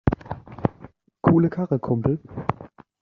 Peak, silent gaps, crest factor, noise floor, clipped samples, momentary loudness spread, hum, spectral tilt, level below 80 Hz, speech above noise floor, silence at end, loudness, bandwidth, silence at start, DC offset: -2 dBFS; none; 22 dB; -48 dBFS; under 0.1%; 13 LU; none; -9.5 dB/octave; -42 dBFS; 26 dB; 0.35 s; -24 LUFS; 4.9 kHz; 0.05 s; under 0.1%